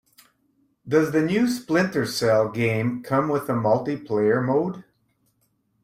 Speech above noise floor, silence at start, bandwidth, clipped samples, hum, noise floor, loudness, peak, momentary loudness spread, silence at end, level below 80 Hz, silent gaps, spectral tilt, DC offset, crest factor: 47 dB; 0.85 s; 16 kHz; under 0.1%; none; -69 dBFS; -23 LUFS; -6 dBFS; 4 LU; 1.05 s; -62 dBFS; none; -6 dB/octave; under 0.1%; 16 dB